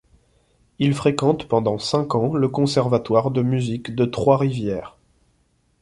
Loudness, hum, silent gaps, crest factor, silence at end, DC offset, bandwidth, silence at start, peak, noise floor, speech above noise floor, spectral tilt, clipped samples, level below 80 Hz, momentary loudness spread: -21 LUFS; none; none; 18 dB; 0.95 s; under 0.1%; 11.5 kHz; 0.8 s; -2 dBFS; -64 dBFS; 44 dB; -7 dB/octave; under 0.1%; -52 dBFS; 5 LU